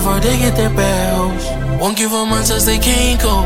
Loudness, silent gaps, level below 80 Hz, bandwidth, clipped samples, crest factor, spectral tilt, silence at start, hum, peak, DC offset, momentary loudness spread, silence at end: -14 LUFS; none; -20 dBFS; 17 kHz; under 0.1%; 14 dB; -4 dB/octave; 0 s; none; 0 dBFS; under 0.1%; 5 LU; 0 s